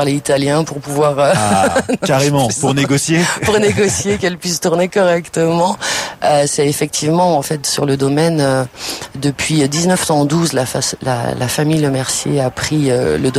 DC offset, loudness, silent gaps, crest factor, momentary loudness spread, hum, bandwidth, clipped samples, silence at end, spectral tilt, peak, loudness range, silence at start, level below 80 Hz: under 0.1%; -14 LUFS; none; 12 dB; 5 LU; none; 16 kHz; under 0.1%; 0 s; -4.5 dB/octave; -4 dBFS; 2 LU; 0 s; -44 dBFS